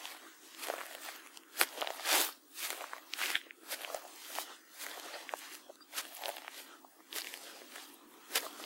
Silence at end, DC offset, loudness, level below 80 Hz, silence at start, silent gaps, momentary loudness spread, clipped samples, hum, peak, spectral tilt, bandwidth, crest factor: 0 s; under 0.1%; -39 LUFS; under -90 dBFS; 0 s; none; 17 LU; under 0.1%; none; -8 dBFS; 3 dB/octave; 16.5 kHz; 34 dB